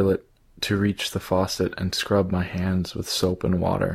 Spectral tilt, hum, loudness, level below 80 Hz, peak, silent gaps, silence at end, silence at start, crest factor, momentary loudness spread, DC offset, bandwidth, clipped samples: -5.5 dB/octave; none; -25 LUFS; -46 dBFS; -8 dBFS; none; 0 s; 0 s; 16 dB; 4 LU; under 0.1%; 15.5 kHz; under 0.1%